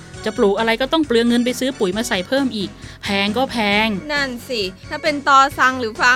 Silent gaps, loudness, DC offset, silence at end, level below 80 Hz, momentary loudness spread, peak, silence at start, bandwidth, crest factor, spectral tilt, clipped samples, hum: none; -18 LUFS; under 0.1%; 0 s; -46 dBFS; 10 LU; 0 dBFS; 0 s; 16 kHz; 18 dB; -4 dB/octave; under 0.1%; none